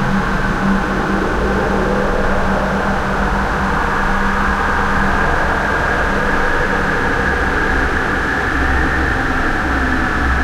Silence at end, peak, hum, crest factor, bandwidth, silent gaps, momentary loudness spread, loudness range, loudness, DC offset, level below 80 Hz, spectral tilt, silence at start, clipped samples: 0 s; -4 dBFS; none; 12 dB; 14 kHz; none; 2 LU; 1 LU; -16 LUFS; under 0.1%; -22 dBFS; -6 dB/octave; 0 s; under 0.1%